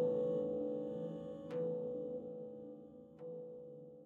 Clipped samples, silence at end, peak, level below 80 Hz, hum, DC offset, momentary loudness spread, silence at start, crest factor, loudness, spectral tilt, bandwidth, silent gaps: under 0.1%; 0 s; -26 dBFS; -78 dBFS; none; under 0.1%; 16 LU; 0 s; 16 dB; -43 LUFS; -10 dB/octave; 4 kHz; none